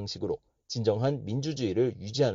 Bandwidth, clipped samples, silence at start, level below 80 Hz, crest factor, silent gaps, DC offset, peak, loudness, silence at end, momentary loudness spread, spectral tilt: 7.6 kHz; under 0.1%; 0 s; -62 dBFS; 16 dB; none; under 0.1%; -12 dBFS; -30 LUFS; 0 s; 8 LU; -6.5 dB/octave